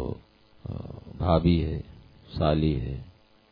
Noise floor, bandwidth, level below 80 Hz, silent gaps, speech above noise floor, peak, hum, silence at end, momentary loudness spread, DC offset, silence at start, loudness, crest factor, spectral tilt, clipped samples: -53 dBFS; 5.2 kHz; -38 dBFS; none; 28 dB; -8 dBFS; none; 0.4 s; 19 LU; under 0.1%; 0 s; -27 LUFS; 20 dB; -10.5 dB/octave; under 0.1%